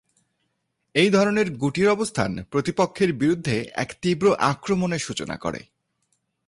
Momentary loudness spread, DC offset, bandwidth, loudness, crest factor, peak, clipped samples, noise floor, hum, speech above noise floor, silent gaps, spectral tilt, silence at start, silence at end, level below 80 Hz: 10 LU; under 0.1%; 11.5 kHz; -23 LUFS; 18 dB; -6 dBFS; under 0.1%; -75 dBFS; none; 53 dB; none; -5.5 dB/octave; 0.95 s; 0.9 s; -54 dBFS